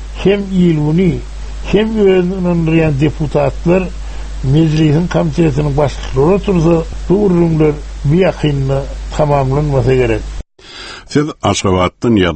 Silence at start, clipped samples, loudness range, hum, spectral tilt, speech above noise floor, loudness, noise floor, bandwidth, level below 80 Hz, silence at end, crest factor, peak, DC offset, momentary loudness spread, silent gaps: 0 s; under 0.1%; 2 LU; none; -7 dB/octave; 21 dB; -13 LUFS; -32 dBFS; 8.6 kHz; -26 dBFS; 0 s; 12 dB; 0 dBFS; under 0.1%; 12 LU; none